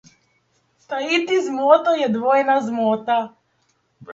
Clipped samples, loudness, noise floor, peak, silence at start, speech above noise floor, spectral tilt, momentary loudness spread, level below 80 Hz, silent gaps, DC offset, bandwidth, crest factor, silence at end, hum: under 0.1%; -19 LUFS; -66 dBFS; 0 dBFS; 0.9 s; 47 dB; -4.5 dB/octave; 9 LU; -72 dBFS; none; under 0.1%; 7.8 kHz; 20 dB; 0 s; none